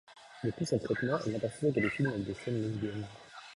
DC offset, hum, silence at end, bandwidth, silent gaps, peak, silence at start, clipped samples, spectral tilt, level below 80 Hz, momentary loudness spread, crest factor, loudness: under 0.1%; none; 0 s; 11.5 kHz; none; -16 dBFS; 0.1 s; under 0.1%; -6.5 dB/octave; -62 dBFS; 12 LU; 18 dB; -34 LUFS